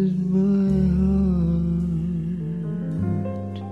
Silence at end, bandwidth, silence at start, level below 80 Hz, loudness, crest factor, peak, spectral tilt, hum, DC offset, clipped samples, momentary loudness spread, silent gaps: 0 s; 5.6 kHz; 0 s; -34 dBFS; -23 LUFS; 10 dB; -12 dBFS; -11 dB/octave; none; 0.3%; under 0.1%; 8 LU; none